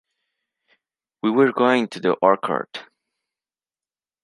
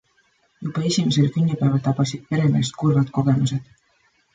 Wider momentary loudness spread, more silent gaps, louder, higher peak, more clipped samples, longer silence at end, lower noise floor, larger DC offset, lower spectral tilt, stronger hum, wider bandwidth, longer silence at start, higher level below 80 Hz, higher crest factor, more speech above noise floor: first, 11 LU vs 6 LU; neither; about the same, -20 LUFS vs -21 LUFS; first, -2 dBFS vs -8 dBFS; neither; first, 1.4 s vs 0.7 s; first, under -90 dBFS vs -63 dBFS; neither; about the same, -6 dB/octave vs -6.5 dB/octave; neither; first, 11.5 kHz vs 9.2 kHz; first, 1.25 s vs 0.6 s; second, -76 dBFS vs -56 dBFS; first, 22 dB vs 14 dB; first, over 71 dB vs 43 dB